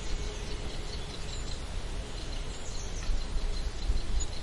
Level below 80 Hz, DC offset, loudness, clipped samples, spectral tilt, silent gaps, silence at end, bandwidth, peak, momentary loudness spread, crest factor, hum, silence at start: -34 dBFS; under 0.1%; -38 LUFS; under 0.1%; -4 dB/octave; none; 0 s; 11.5 kHz; -18 dBFS; 4 LU; 14 dB; none; 0 s